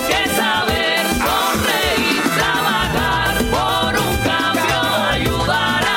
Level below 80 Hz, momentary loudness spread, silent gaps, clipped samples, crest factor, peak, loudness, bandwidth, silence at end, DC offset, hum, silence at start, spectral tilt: -32 dBFS; 1 LU; none; under 0.1%; 14 dB; -2 dBFS; -16 LUFS; 17 kHz; 0 s; under 0.1%; none; 0 s; -3.5 dB/octave